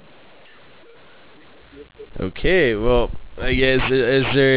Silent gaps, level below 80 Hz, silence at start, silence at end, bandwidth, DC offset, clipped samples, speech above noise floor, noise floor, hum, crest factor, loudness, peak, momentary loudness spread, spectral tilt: none; -32 dBFS; 1.75 s; 0 s; 4 kHz; under 0.1%; under 0.1%; 30 dB; -48 dBFS; none; 14 dB; -19 LUFS; -6 dBFS; 13 LU; -9.5 dB/octave